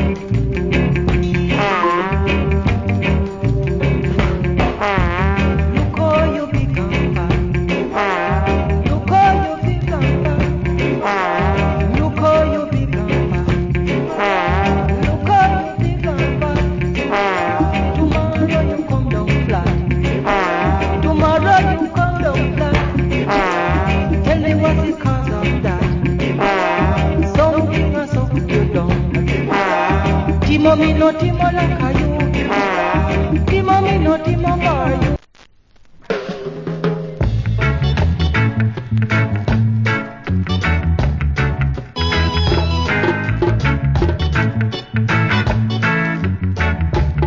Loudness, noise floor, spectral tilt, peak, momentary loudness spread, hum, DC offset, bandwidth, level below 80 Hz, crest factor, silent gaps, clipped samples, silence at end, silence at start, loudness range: -16 LUFS; -48 dBFS; -7.5 dB/octave; 0 dBFS; 5 LU; none; under 0.1%; 7.6 kHz; -24 dBFS; 16 dB; none; under 0.1%; 0 s; 0 s; 2 LU